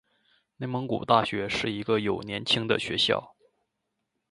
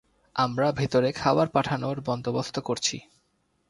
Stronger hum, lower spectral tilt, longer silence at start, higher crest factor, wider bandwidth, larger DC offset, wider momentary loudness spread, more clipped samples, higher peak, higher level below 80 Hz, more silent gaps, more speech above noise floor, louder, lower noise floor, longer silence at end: neither; about the same, -4.5 dB/octave vs -5 dB/octave; first, 0.6 s vs 0.35 s; about the same, 24 dB vs 20 dB; about the same, 11 kHz vs 11.5 kHz; neither; about the same, 8 LU vs 6 LU; neither; first, -4 dBFS vs -8 dBFS; about the same, -60 dBFS vs -58 dBFS; neither; first, 54 dB vs 45 dB; about the same, -27 LUFS vs -26 LUFS; first, -81 dBFS vs -71 dBFS; first, 1.05 s vs 0.7 s